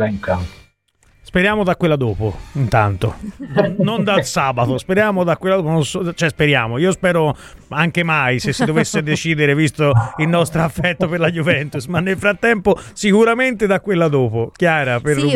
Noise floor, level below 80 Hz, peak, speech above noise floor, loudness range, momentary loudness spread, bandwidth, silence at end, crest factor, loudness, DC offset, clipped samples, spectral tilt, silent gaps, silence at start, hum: -56 dBFS; -42 dBFS; 0 dBFS; 40 dB; 2 LU; 6 LU; 15 kHz; 0 s; 16 dB; -16 LUFS; 0.1%; under 0.1%; -6 dB/octave; none; 0 s; none